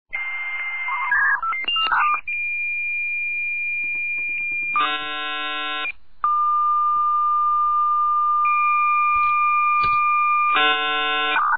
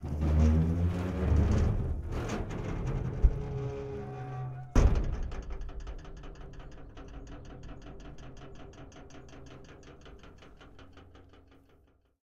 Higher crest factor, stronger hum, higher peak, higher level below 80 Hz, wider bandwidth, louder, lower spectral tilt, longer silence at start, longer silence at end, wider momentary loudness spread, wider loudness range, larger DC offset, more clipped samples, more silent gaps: second, 14 dB vs 24 dB; neither; about the same, -8 dBFS vs -8 dBFS; second, -56 dBFS vs -36 dBFS; second, 4.9 kHz vs 7.8 kHz; first, -20 LUFS vs -32 LUFS; second, -4 dB/octave vs -8 dB/octave; about the same, 0.05 s vs 0 s; second, 0 s vs 0.85 s; second, 7 LU vs 25 LU; second, 4 LU vs 21 LU; first, 1% vs under 0.1%; neither; neither